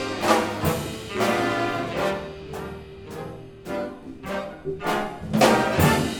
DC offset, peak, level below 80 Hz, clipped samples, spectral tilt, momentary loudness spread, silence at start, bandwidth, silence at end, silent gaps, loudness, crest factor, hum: under 0.1%; -4 dBFS; -46 dBFS; under 0.1%; -5 dB/octave; 18 LU; 0 s; over 20 kHz; 0 s; none; -24 LUFS; 22 dB; none